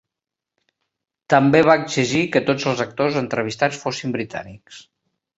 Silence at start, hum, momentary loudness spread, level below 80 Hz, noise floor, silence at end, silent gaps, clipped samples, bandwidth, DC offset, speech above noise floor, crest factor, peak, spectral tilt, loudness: 1.3 s; none; 12 LU; -58 dBFS; -86 dBFS; 0.6 s; none; under 0.1%; 8 kHz; under 0.1%; 67 dB; 20 dB; -2 dBFS; -5 dB/octave; -19 LUFS